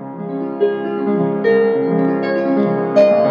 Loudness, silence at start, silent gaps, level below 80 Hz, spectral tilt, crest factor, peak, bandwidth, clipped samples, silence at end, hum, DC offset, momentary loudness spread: -16 LUFS; 0 s; none; -74 dBFS; -9 dB/octave; 14 dB; -2 dBFS; 6.8 kHz; under 0.1%; 0 s; none; under 0.1%; 8 LU